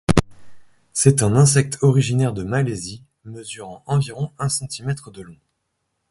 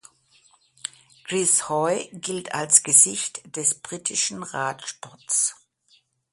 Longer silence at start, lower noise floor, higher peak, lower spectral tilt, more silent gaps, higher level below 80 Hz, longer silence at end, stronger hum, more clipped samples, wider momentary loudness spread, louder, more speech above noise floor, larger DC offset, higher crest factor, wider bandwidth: second, 0.1 s vs 1.25 s; first, -74 dBFS vs -63 dBFS; about the same, 0 dBFS vs 0 dBFS; first, -5.5 dB/octave vs -1.5 dB/octave; neither; first, -42 dBFS vs -72 dBFS; about the same, 0.75 s vs 0.8 s; neither; neither; about the same, 20 LU vs 21 LU; about the same, -19 LUFS vs -21 LUFS; first, 54 dB vs 39 dB; neither; about the same, 20 dB vs 24 dB; about the same, 11.5 kHz vs 12 kHz